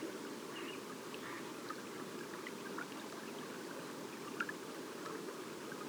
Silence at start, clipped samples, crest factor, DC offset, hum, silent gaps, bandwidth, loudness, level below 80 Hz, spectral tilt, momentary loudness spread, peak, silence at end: 0 s; under 0.1%; 22 dB; under 0.1%; none; none; over 20 kHz; -46 LUFS; under -90 dBFS; -3.5 dB/octave; 4 LU; -26 dBFS; 0 s